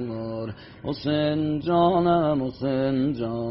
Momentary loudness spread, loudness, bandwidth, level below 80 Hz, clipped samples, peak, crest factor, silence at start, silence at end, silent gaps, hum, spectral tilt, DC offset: 13 LU; -24 LUFS; 5.8 kHz; -52 dBFS; under 0.1%; -10 dBFS; 14 dB; 0 s; 0 s; none; none; -6.5 dB/octave; under 0.1%